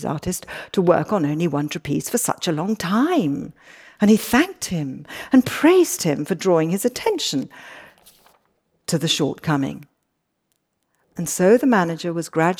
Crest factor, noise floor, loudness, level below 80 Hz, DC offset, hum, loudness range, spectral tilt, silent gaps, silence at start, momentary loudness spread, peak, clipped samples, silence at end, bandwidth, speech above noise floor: 18 dB; -73 dBFS; -20 LUFS; -56 dBFS; under 0.1%; none; 7 LU; -5 dB/octave; none; 0 s; 14 LU; -4 dBFS; under 0.1%; 0.05 s; over 20 kHz; 53 dB